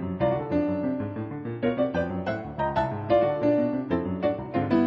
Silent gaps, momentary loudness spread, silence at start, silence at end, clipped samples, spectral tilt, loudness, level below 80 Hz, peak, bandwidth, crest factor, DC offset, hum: none; 8 LU; 0 s; 0 s; under 0.1%; -9.5 dB/octave; -27 LUFS; -50 dBFS; -10 dBFS; 6 kHz; 16 dB; under 0.1%; none